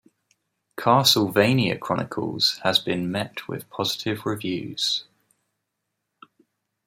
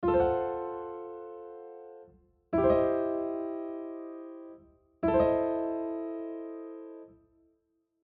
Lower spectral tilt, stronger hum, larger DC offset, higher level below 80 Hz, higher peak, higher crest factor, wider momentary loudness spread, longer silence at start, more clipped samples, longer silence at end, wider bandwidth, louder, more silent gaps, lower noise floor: second, -4 dB/octave vs -7.5 dB/octave; neither; neither; second, -64 dBFS vs -56 dBFS; first, -2 dBFS vs -14 dBFS; about the same, 22 dB vs 18 dB; second, 11 LU vs 21 LU; first, 0.75 s vs 0 s; neither; first, 1.85 s vs 0.9 s; first, 16 kHz vs 4.6 kHz; first, -23 LUFS vs -31 LUFS; neither; first, -80 dBFS vs -76 dBFS